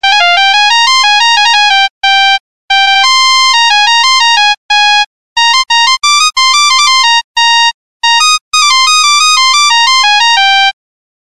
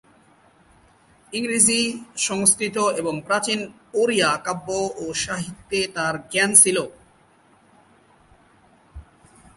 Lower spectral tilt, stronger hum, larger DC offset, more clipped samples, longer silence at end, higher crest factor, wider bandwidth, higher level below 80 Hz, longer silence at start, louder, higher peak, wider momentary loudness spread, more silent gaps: second, 6 dB/octave vs -2 dB/octave; neither; first, 3% vs under 0.1%; neither; about the same, 0.55 s vs 0.55 s; second, 8 dB vs 24 dB; first, 16 kHz vs 12 kHz; first, -50 dBFS vs -56 dBFS; second, 0 s vs 1.3 s; first, -5 LUFS vs -20 LUFS; about the same, 0 dBFS vs 0 dBFS; second, 3 LU vs 13 LU; first, 1.90-2.01 s, 2.40-2.68 s, 4.57-4.69 s, 5.06-5.36 s, 7.24-7.34 s, 7.74-8.00 s, 8.41-8.51 s vs none